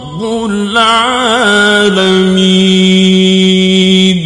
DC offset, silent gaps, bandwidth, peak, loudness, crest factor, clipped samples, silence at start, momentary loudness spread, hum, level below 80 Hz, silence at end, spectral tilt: under 0.1%; none; 11 kHz; 0 dBFS; -8 LUFS; 8 dB; 0.3%; 0 s; 6 LU; none; -42 dBFS; 0 s; -5 dB/octave